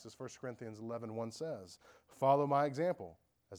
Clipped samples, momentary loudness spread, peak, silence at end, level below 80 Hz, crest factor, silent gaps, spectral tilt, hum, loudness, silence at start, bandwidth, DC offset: under 0.1%; 17 LU; -18 dBFS; 0 s; -80 dBFS; 20 dB; none; -6.5 dB/octave; none; -37 LUFS; 0 s; 20 kHz; under 0.1%